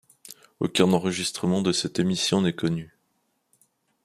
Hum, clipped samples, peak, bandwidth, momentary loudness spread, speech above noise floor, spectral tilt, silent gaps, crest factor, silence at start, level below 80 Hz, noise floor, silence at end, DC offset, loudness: none; under 0.1%; -4 dBFS; 15 kHz; 15 LU; 49 dB; -4.5 dB/octave; none; 22 dB; 0.25 s; -62 dBFS; -72 dBFS; 1.2 s; under 0.1%; -24 LUFS